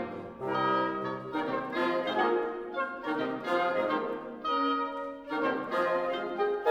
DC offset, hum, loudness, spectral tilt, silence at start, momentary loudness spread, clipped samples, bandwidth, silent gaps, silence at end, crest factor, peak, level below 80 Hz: under 0.1%; none; -31 LUFS; -6 dB/octave; 0 s; 7 LU; under 0.1%; 13 kHz; none; 0 s; 18 dB; -14 dBFS; -68 dBFS